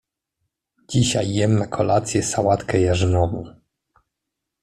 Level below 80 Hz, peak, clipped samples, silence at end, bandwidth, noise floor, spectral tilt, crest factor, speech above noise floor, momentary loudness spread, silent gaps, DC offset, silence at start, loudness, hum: -48 dBFS; -4 dBFS; under 0.1%; 1.15 s; 13 kHz; -82 dBFS; -5.5 dB/octave; 16 dB; 63 dB; 6 LU; none; under 0.1%; 0.9 s; -20 LUFS; none